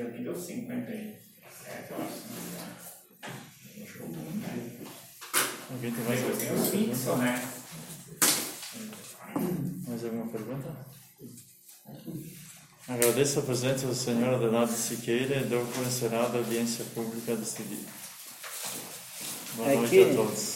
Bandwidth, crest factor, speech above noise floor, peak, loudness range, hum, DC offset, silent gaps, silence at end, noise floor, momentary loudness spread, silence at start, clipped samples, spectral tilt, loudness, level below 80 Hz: 16.5 kHz; 26 dB; 21 dB; -6 dBFS; 12 LU; none; under 0.1%; none; 0 s; -50 dBFS; 20 LU; 0 s; under 0.1%; -4 dB/octave; -30 LUFS; -68 dBFS